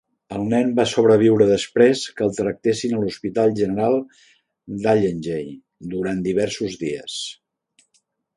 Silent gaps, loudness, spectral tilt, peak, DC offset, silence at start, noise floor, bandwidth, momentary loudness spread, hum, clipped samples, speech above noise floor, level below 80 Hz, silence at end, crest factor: none; -20 LUFS; -5.5 dB/octave; -2 dBFS; under 0.1%; 0.3 s; -67 dBFS; 11.5 kHz; 14 LU; none; under 0.1%; 47 dB; -56 dBFS; 1.05 s; 18 dB